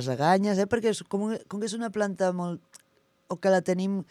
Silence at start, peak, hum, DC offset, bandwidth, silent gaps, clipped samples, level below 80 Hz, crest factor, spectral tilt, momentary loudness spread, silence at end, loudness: 0 s; -10 dBFS; none; under 0.1%; 13 kHz; none; under 0.1%; -68 dBFS; 18 dB; -6 dB/octave; 9 LU; 0.05 s; -27 LUFS